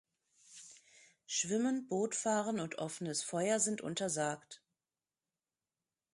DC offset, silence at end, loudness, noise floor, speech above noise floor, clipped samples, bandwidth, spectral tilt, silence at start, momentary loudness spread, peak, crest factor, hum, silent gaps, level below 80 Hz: under 0.1%; 1.6 s; -36 LUFS; under -90 dBFS; over 54 dB; under 0.1%; 11.5 kHz; -3.5 dB/octave; 0.5 s; 21 LU; -20 dBFS; 18 dB; none; none; -82 dBFS